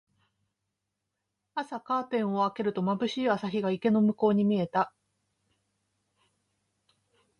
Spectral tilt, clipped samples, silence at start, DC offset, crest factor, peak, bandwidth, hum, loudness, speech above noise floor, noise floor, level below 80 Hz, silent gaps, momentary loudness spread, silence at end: -7.5 dB/octave; under 0.1%; 1.55 s; under 0.1%; 18 dB; -12 dBFS; 6.8 kHz; none; -28 LUFS; 57 dB; -84 dBFS; -74 dBFS; none; 10 LU; 2.5 s